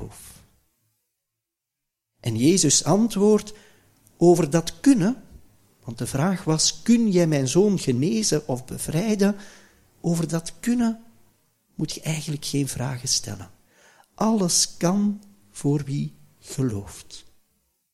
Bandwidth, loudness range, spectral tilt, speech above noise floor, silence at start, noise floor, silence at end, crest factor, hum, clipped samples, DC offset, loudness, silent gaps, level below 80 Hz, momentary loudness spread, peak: 15.5 kHz; 6 LU; -4.5 dB/octave; 62 dB; 0 s; -84 dBFS; 0.75 s; 20 dB; none; under 0.1%; under 0.1%; -22 LUFS; none; -52 dBFS; 18 LU; -4 dBFS